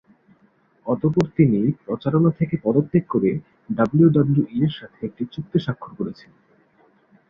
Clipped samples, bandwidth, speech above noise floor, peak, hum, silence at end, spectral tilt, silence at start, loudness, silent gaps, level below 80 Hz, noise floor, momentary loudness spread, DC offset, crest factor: under 0.1%; 6.8 kHz; 39 dB; -2 dBFS; none; 1.15 s; -10 dB/octave; 0.85 s; -21 LUFS; none; -56 dBFS; -60 dBFS; 15 LU; under 0.1%; 18 dB